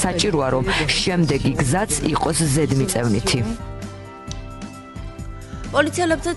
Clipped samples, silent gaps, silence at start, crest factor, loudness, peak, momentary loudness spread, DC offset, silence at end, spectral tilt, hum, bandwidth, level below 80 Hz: under 0.1%; none; 0 s; 18 dB; -20 LUFS; -4 dBFS; 16 LU; under 0.1%; 0 s; -4.5 dB/octave; none; 12 kHz; -36 dBFS